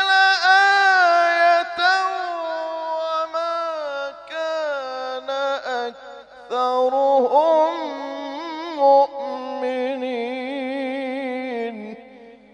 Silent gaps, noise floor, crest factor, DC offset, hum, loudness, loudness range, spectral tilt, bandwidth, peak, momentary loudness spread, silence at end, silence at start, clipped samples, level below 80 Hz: none; -45 dBFS; 18 dB; under 0.1%; 50 Hz at -70 dBFS; -20 LUFS; 8 LU; -2 dB/octave; 9.2 kHz; -2 dBFS; 15 LU; 0.2 s; 0 s; under 0.1%; -70 dBFS